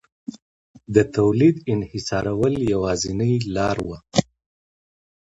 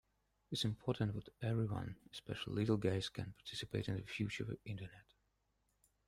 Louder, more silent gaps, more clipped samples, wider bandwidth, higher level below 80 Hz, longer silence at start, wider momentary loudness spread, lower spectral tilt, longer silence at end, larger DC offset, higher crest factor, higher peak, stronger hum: first, -21 LUFS vs -42 LUFS; first, 0.42-0.74 s vs none; neither; second, 8.6 kHz vs 14 kHz; first, -46 dBFS vs -66 dBFS; second, 0.3 s vs 0.5 s; about the same, 9 LU vs 11 LU; about the same, -6 dB/octave vs -6 dB/octave; about the same, 1.05 s vs 1.05 s; neither; about the same, 22 dB vs 20 dB; first, 0 dBFS vs -22 dBFS; neither